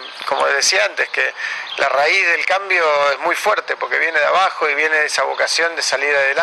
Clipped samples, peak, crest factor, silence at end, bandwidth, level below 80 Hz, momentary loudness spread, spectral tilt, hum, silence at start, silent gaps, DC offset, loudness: under 0.1%; -2 dBFS; 16 dB; 0 s; 12.5 kHz; -72 dBFS; 6 LU; 0.5 dB/octave; none; 0 s; none; under 0.1%; -16 LUFS